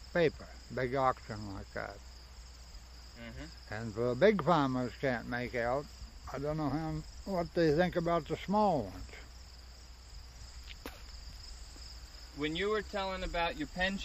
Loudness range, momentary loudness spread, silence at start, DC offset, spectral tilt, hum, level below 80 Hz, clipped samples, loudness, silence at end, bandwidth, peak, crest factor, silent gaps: 9 LU; 22 LU; 0 s; under 0.1%; -6 dB/octave; none; -50 dBFS; under 0.1%; -34 LUFS; 0 s; 15.5 kHz; -14 dBFS; 22 dB; none